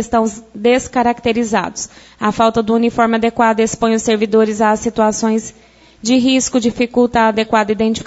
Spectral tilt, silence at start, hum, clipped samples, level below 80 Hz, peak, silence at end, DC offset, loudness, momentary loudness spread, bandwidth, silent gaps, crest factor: -4 dB/octave; 0 s; none; under 0.1%; -44 dBFS; -2 dBFS; 0 s; under 0.1%; -15 LUFS; 7 LU; 8 kHz; none; 14 dB